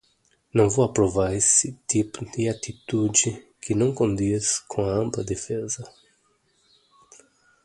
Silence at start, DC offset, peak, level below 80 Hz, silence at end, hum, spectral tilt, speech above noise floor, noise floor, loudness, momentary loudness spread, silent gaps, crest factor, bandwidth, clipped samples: 0.55 s; under 0.1%; -4 dBFS; -50 dBFS; 1.75 s; none; -4.5 dB/octave; 43 dB; -66 dBFS; -23 LUFS; 10 LU; none; 22 dB; 11.5 kHz; under 0.1%